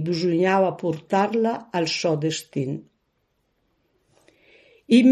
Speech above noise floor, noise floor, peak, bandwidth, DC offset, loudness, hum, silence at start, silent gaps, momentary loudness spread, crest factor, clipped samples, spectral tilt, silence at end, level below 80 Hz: 48 dB; -71 dBFS; -4 dBFS; 13.5 kHz; under 0.1%; -23 LUFS; none; 0 s; none; 9 LU; 18 dB; under 0.1%; -5.5 dB/octave; 0 s; -70 dBFS